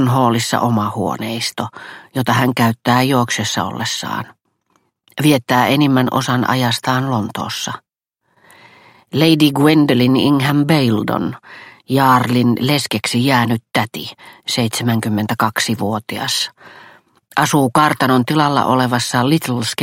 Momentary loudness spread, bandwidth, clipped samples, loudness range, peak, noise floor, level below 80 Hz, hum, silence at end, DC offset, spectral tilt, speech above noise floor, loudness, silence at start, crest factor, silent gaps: 11 LU; 16.5 kHz; under 0.1%; 4 LU; 0 dBFS; -68 dBFS; -56 dBFS; none; 0 s; under 0.1%; -5 dB/octave; 52 dB; -16 LUFS; 0 s; 16 dB; none